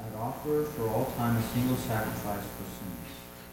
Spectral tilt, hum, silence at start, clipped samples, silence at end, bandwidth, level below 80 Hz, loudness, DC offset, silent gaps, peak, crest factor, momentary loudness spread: -6 dB/octave; 60 Hz at -45 dBFS; 0 s; under 0.1%; 0 s; 17 kHz; -50 dBFS; -32 LUFS; under 0.1%; none; -16 dBFS; 16 dB; 11 LU